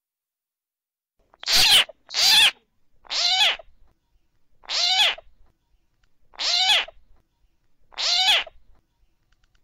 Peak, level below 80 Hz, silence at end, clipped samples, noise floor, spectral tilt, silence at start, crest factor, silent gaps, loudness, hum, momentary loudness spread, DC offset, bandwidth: -8 dBFS; -54 dBFS; 1.2 s; under 0.1%; under -90 dBFS; 2 dB/octave; 1.45 s; 16 dB; none; -18 LUFS; none; 18 LU; under 0.1%; 16 kHz